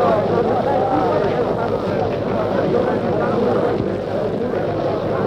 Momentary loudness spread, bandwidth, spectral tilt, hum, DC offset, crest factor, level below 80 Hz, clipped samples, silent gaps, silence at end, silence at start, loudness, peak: 4 LU; 9.6 kHz; -8 dB/octave; none; under 0.1%; 12 dB; -44 dBFS; under 0.1%; none; 0 s; 0 s; -19 LUFS; -6 dBFS